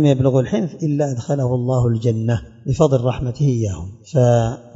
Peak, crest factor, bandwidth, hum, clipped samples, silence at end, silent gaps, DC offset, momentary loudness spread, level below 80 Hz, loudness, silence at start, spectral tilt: -2 dBFS; 16 dB; 7.8 kHz; none; under 0.1%; 0.05 s; none; under 0.1%; 7 LU; -42 dBFS; -19 LUFS; 0 s; -8 dB/octave